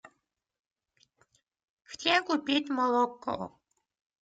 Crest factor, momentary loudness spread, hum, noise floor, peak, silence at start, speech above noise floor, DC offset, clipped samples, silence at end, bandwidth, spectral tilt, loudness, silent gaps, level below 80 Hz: 24 dB; 13 LU; none; -79 dBFS; -10 dBFS; 1.9 s; 50 dB; under 0.1%; under 0.1%; 0.75 s; 9.2 kHz; -3.5 dB/octave; -29 LUFS; none; -74 dBFS